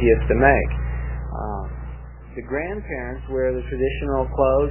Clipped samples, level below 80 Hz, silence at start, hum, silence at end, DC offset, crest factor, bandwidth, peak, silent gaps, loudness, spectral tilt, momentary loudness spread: under 0.1%; -28 dBFS; 0 s; 60 Hz at -30 dBFS; 0 s; 0.2%; 22 dB; 3.2 kHz; 0 dBFS; none; -22 LUFS; -11.5 dB/octave; 18 LU